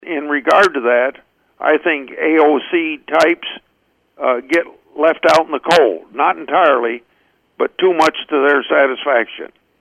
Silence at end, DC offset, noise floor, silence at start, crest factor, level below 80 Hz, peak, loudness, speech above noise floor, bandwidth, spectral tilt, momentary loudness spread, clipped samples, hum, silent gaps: 0.35 s; under 0.1%; -62 dBFS; 0.05 s; 16 dB; -64 dBFS; 0 dBFS; -15 LUFS; 47 dB; 14 kHz; -4 dB/octave; 10 LU; under 0.1%; none; none